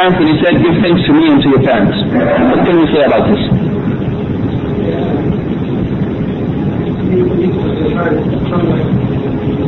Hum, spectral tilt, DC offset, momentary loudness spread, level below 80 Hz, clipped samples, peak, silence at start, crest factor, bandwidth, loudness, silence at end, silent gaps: none; -9.5 dB/octave; under 0.1%; 7 LU; -30 dBFS; under 0.1%; -2 dBFS; 0 s; 8 dB; 5.8 kHz; -12 LUFS; 0 s; none